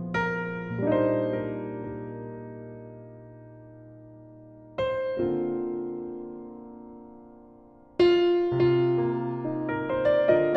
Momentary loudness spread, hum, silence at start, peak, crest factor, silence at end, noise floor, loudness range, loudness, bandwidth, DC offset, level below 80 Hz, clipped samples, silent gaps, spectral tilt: 25 LU; none; 0 s; -8 dBFS; 18 dB; 0 s; -52 dBFS; 11 LU; -27 LUFS; 6.2 kHz; under 0.1%; -58 dBFS; under 0.1%; none; -8.5 dB/octave